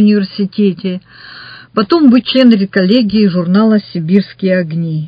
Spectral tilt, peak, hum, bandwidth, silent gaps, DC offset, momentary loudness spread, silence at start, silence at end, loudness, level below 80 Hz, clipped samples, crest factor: -9 dB/octave; 0 dBFS; none; 5.2 kHz; none; under 0.1%; 12 LU; 0 s; 0 s; -11 LUFS; -52 dBFS; 0.3%; 12 dB